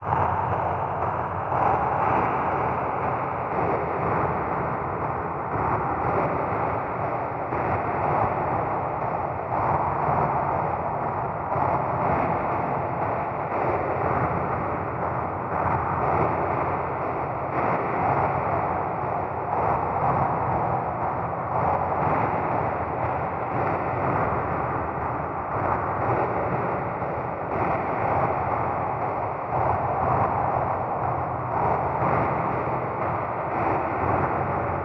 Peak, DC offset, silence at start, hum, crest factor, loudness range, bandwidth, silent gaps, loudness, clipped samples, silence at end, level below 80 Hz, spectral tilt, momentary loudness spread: -10 dBFS; under 0.1%; 0 s; none; 16 dB; 1 LU; 6.2 kHz; none; -25 LUFS; under 0.1%; 0 s; -48 dBFS; -10 dB/octave; 4 LU